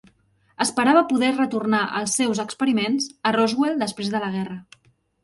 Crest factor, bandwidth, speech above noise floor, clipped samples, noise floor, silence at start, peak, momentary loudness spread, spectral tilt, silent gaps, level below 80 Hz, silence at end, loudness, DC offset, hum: 18 dB; 11.5 kHz; 41 dB; under 0.1%; -62 dBFS; 0.6 s; -6 dBFS; 8 LU; -3.5 dB/octave; none; -66 dBFS; 0.6 s; -22 LUFS; under 0.1%; none